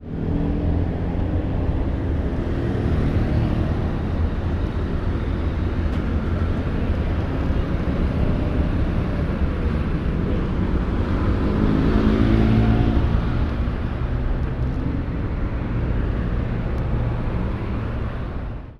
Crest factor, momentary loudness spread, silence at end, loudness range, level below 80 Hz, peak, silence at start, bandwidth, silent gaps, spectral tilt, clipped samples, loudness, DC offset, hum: 16 dB; 7 LU; 0.05 s; 5 LU; -26 dBFS; -6 dBFS; 0 s; 6.4 kHz; none; -9.5 dB/octave; under 0.1%; -23 LUFS; under 0.1%; none